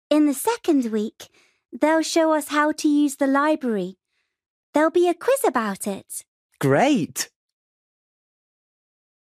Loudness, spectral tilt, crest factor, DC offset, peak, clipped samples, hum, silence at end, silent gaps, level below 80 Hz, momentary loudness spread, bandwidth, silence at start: -21 LUFS; -4.5 dB/octave; 18 dB; under 0.1%; -6 dBFS; under 0.1%; none; 2 s; 4.46-4.73 s, 6.28-6.49 s; -70 dBFS; 10 LU; 15.5 kHz; 0.1 s